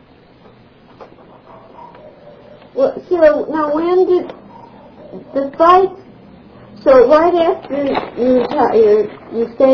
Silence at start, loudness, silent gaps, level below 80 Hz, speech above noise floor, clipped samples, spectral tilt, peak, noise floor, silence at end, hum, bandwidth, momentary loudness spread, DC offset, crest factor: 1 s; -13 LUFS; none; -48 dBFS; 32 dB; under 0.1%; -7.5 dB/octave; 0 dBFS; -44 dBFS; 0 s; none; 5.4 kHz; 12 LU; under 0.1%; 16 dB